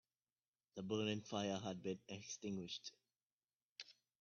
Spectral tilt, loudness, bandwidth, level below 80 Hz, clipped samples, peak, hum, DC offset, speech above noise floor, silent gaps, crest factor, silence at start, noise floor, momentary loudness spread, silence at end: -4.5 dB/octave; -46 LUFS; 7 kHz; -84 dBFS; under 0.1%; -28 dBFS; none; under 0.1%; over 44 dB; 3.32-3.37 s, 3.65-3.76 s; 22 dB; 0.75 s; under -90 dBFS; 15 LU; 0.3 s